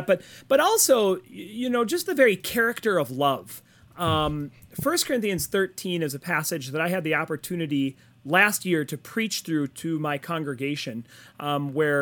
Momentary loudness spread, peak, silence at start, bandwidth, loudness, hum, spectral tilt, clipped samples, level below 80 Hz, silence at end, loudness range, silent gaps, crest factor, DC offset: 11 LU; -4 dBFS; 0 s; 19 kHz; -25 LUFS; none; -4 dB/octave; under 0.1%; -56 dBFS; 0 s; 4 LU; none; 22 dB; under 0.1%